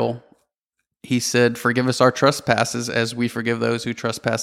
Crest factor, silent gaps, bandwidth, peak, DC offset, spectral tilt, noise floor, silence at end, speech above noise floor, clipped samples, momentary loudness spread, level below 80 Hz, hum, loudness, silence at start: 20 dB; 0.58-0.70 s; 16 kHz; -2 dBFS; under 0.1%; -4.5 dB/octave; -79 dBFS; 0 s; 59 dB; under 0.1%; 8 LU; -60 dBFS; none; -20 LUFS; 0 s